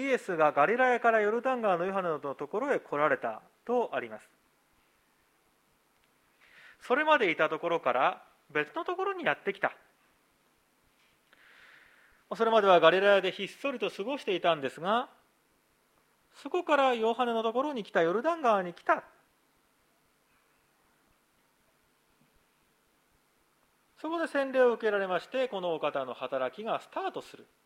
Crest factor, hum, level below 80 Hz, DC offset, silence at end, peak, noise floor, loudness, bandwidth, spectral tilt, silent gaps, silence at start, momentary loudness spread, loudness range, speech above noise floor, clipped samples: 24 dB; none; -82 dBFS; under 0.1%; 0.25 s; -6 dBFS; -70 dBFS; -29 LUFS; 13.5 kHz; -5 dB/octave; none; 0 s; 11 LU; 10 LU; 41 dB; under 0.1%